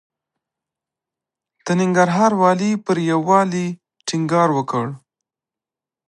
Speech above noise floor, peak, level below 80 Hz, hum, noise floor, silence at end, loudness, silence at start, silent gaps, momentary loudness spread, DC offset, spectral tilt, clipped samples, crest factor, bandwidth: 72 dB; -2 dBFS; -68 dBFS; none; -89 dBFS; 1.1 s; -18 LUFS; 1.65 s; none; 12 LU; under 0.1%; -6 dB/octave; under 0.1%; 18 dB; 10.5 kHz